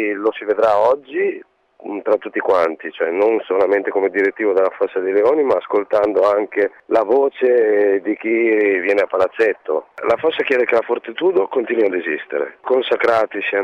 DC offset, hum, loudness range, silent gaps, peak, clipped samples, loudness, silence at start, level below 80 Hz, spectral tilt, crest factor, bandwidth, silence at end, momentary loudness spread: under 0.1%; none; 2 LU; none; -6 dBFS; under 0.1%; -17 LUFS; 0 s; -62 dBFS; -5.5 dB/octave; 12 dB; 7 kHz; 0 s; 7 LU